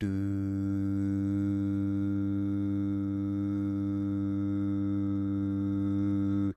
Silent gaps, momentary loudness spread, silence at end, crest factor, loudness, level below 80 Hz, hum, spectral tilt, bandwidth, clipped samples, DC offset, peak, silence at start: none; 2 LU; 0.05 s; 10 dB; -31 LUFS; -60 dBFS; none; -10 dB/octave; 6 kHz; under 0.1%; under 0.1%; -20 dBFS; 0 s